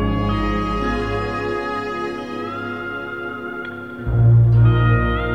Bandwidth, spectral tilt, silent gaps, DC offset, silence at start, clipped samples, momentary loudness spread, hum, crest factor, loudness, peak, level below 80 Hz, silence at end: 6.2 kHz; -8.5 dB/octave; none; 0.2%; 0 s; under 0.1%; 14 LU; none; 14 dB; -20 LUFS; -4 dBFS; -30 dBFS; 0 s